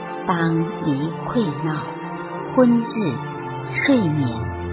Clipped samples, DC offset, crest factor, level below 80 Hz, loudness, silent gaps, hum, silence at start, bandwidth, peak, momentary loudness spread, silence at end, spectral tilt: under 0.1%; under 0.1%; 18 dB; -46 dBFS; -22 LUFS; none; none; 0 s; 4 kHz; -4 dBFS; 12 LU; 0 s; -11.5 dB/octave